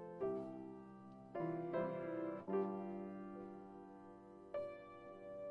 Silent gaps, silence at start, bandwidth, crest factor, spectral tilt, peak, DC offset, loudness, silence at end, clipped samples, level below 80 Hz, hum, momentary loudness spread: none; 0 s; 5.4 kHz; 18 dB; -9.5 dB/octave; -30 dBFS; under 0.1%; -47 LUFS; 0 s; under 0.1%; -78 dBFS; none; 15 LU